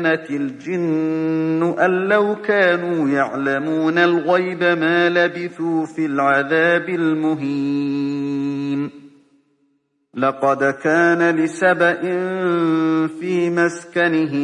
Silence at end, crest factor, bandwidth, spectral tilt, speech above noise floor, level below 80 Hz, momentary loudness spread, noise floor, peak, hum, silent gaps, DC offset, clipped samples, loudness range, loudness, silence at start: 0 s; 16 dB; 9.8 kHz; -6.5 dB/octave; 48 dB; -72 dBFS; 7 LU; -65 dBFS; -2 dBFS; none; none; under 0.1%; under 0.1%; 5 LU; -18 LUFS; 0 s